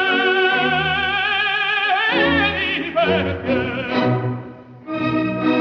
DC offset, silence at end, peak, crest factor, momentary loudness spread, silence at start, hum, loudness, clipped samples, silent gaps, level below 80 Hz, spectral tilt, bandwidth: under 0.1%; 0 s; -4 dBFS; 14 dB; 8 LU; 0 s; none; -18 LUFS; under 0.1%; none; -46 dBFS; -6.5 dB/octave; 6.8 kHz